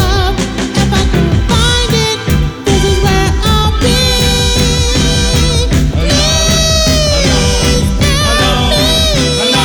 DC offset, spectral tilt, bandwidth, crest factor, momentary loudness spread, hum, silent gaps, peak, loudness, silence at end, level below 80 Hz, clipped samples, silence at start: under 0.1%; -4 dB/octave; over 20 kHz; 10 dB; 3 LU; none; none; 0 dBFS; -10 LUFS; 0 s; -16 dBFS; under 0.1%; 0 s